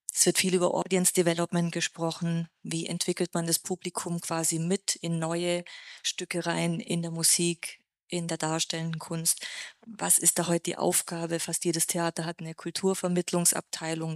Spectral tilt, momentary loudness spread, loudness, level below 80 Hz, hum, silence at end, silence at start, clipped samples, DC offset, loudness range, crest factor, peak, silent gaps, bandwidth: -3.5 dB/octave; 11 LU; -28 LUFS; -74 dBFS; none; 0 s; 0.1 s; under 0.1%; under 0.1%; 3 LU; 22 dB; -8 dBFS; 8.03-8.07 s; 15.5 kHz